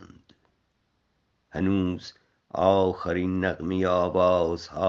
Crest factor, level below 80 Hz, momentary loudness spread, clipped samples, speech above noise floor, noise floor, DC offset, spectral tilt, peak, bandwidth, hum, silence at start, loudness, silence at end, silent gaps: 20 dB; -58 dBFS; 14 LU; under 0.1%; 48 dB; -72 dBFS; under 0.1%; -7.5 dB/octave; -6 dBFS; 7.4 kHz; none; 0 s; -25 LUFS; 0 s; none